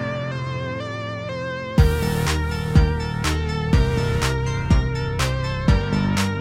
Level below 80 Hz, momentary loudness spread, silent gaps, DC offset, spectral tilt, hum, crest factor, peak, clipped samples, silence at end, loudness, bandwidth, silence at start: -26 dBFS; 9 LU; none; under 0.1%; -6 dB/octave; none; 18 dB; -2 dBFS; under 0.1%; 0 s; -22 LUFS; 16 kHz; 0 s